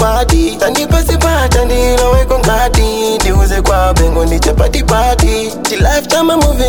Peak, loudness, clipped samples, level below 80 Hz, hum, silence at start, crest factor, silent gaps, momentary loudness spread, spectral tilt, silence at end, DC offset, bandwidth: 0 dBFS; -11 LUFS; under 0.1%; -14 dBFS; none; 0 s; 10 dB; none; 2 LU; -4.5 dB/octave; 0 s; under 0.1%; 19.5 kHz